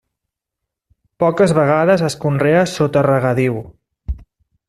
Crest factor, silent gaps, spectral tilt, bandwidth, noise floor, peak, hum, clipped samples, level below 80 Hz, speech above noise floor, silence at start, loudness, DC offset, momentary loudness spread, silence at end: 14 dB; none; -6.5 dB/octave; 13 kHz; -81 dBFS; -2 dBFS; none; under 0.1%; -38 dBFS; 67 dB; 1.2 s; -15 LUFS; under 0.1%; 17 LU; 0.5 s